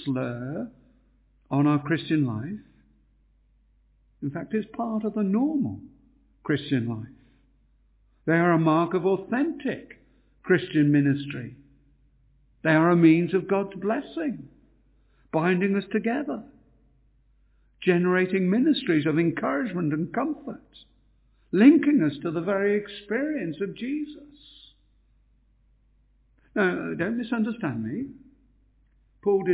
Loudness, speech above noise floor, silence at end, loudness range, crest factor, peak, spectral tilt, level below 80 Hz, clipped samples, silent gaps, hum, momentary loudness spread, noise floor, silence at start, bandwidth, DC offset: -25 LUFS; 39 dB; 0 s; 7 LU; 22 dB; -6 dBFS; -11.5 dB/octave; -62 dBFS; under 0.1%; none; none; 15 LU; -63 dBFS; 0 s; 4 kHz; under 0.1%